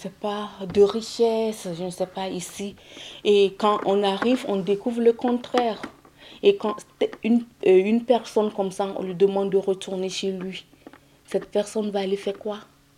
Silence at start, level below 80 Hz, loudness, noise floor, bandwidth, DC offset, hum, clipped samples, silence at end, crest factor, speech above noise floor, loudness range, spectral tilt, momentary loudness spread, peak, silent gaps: 0 s; -62 dBFS; -24 LUFS; -50 dBFS; 14 kHz; under 0.1%; none; under 0.1%; 0.35 s; 18 dB; 26 dB; 4 LU; -5.5 dB/octave; 13 LU; -6 dBFS; none